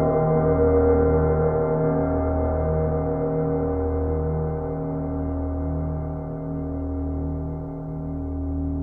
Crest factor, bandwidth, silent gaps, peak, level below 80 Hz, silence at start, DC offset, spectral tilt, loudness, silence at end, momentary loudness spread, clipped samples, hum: 14 dB; 2.4 kHz; none; -8 dBFS; -32 dBFS; 0 s; under 0.1%; -13.5 dB/octave; -24 LUFS; 0 s; 11 LU; under 0.1%; none